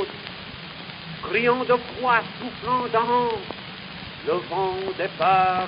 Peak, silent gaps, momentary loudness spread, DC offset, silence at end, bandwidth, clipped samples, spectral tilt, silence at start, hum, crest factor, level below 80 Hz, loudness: -6 dBFS; none; 15 LU; under 0.1%; 0 s; 5.4 kHz; under 0.1%; -9.5 dB/octave; 0 s; none; 18 dB; -54 dBFS; -23 LUFS